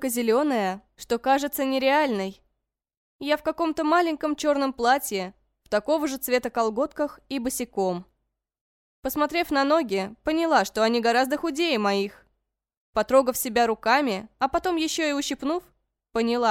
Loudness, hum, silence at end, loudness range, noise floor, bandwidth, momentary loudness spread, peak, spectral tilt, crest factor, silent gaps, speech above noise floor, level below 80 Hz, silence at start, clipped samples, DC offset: -24 LUFS; none; 0 s; 4 LU; -80 dBFS; 17 kHz; 9 LU; -6 dBFS; -3.5 dB/octave; 18 dB; 2.97-3.19 s, 8.61-9.03 s, 12.77-12.93 s; 56 dB; -56 dBFS; 0 s; under 0.1%; under 0.1%